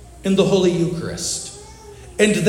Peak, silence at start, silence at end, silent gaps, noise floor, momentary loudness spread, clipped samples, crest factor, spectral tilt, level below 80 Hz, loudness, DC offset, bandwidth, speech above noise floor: -2 dBFS; 0 s; 0 s; none; -39 dBFS; 22 LU; under 0.1%; 18 dB; -4.5 dB/octave; -44 dBFS; -19 LUFS; under 0.1%; 16 kHz; 22 dB